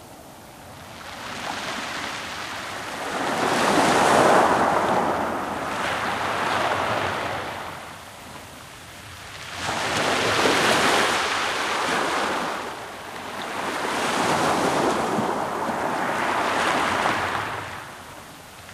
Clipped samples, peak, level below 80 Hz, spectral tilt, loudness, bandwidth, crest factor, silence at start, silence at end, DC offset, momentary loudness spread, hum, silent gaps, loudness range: under 0.1%; -4 dBFS; -54 dBFS; -3 dB/octave; -23 LUFS; 16 kHz; 22 dB; 0 s; 0 s; under 0.1%; 21 LU; none; none; 8 LU